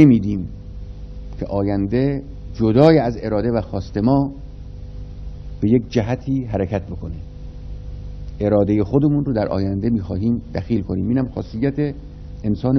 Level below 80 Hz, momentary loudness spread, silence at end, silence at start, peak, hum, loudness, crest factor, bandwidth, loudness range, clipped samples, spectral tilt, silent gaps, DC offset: -34 dBFS; 18 LU; 0 s; 0 s; 0 dBFS; none; -20 LUFS; 20 dB; 6.4 kHz; 5 LU; under 0.1%; -9.5 dB/octave; none; under 0.1%